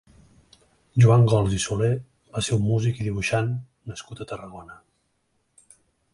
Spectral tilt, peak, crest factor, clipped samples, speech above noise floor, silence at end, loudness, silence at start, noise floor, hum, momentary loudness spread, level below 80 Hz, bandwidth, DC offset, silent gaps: -6 dB/octave; -6 dBFS; 18 dB; under 0.1%; 49 dB; 1.4 s; -22 LUFS; 0.95 s; -71 dBFS; none; 20 LU; -48 dBFS; 11.5 kHz; under 0.1%; none